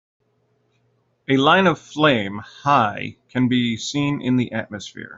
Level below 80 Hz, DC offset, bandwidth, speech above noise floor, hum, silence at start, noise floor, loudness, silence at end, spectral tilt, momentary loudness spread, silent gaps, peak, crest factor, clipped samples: -60 dBFS; under 0.1%; 7.8 kHz; 46 dB; none; 1.3 s; -66 dBFS; -20 LUFS; 0.05 s; -5.5 dB/octave; 15 LU; none; -2 dBFS; 18 dB; under 0.1%